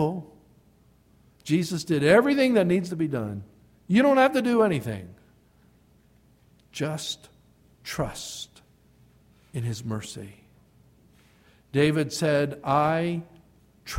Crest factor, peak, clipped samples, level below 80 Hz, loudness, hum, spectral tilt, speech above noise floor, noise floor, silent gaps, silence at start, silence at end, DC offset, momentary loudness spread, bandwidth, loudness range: 22 dB; -6 dBFS; under 0.1%; -58 dBFS; -25 LUFS; none; -6 dB/octave; 36 dB; -60 dBFS; none; 0 s; 0 s; under 0.1%; 19 LU; 16.5 kHz; 14 LU